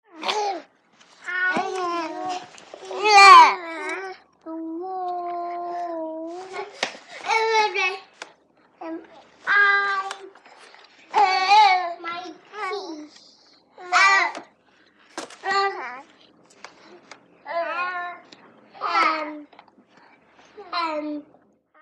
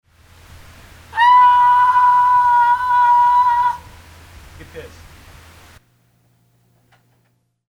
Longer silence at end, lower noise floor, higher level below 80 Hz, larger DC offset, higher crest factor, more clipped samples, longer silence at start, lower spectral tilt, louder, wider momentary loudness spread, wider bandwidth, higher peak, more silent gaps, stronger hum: second, 0.6 s vs 2.8 s; second, -59 dBFS vs -64 dBFS; second, -82 dBFS vs -50 dBFS; neither; first, 24 dB vs 14 dB; neither; second, 0.15 s vs 1.15 s; second, -0.5 dB/octave vs -2.5 dB/octave; second, -20 LUFS vs -12 LUFS; first, 22 LU vs 16 LU; first, 12.5 kHz vs 10.5 kHz; first, 0 dBFS vs -4 dBFS; neither; neither